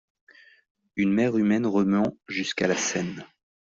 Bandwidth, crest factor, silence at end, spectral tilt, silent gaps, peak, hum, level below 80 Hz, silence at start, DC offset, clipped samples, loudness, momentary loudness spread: 7.6 kHz; 16 dB; 0.35 s; -5 dB/octave; none; -10 dBFS; none; -64 dBFS; 0.95 s; under 0.1%; under 0.1%; -25 LUFS; 10 LU